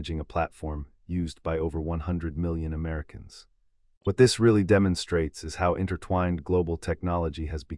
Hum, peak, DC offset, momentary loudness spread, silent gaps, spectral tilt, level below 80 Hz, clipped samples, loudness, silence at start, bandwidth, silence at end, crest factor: none; -6 dBFS; under 0.1%; 13 LU; 3.97-4.01 s; -6.5 dB/octave; -42 dBFS; under 0.1%; -27 LUFS; 0 s; 12 kHz; 0 s; 20 dB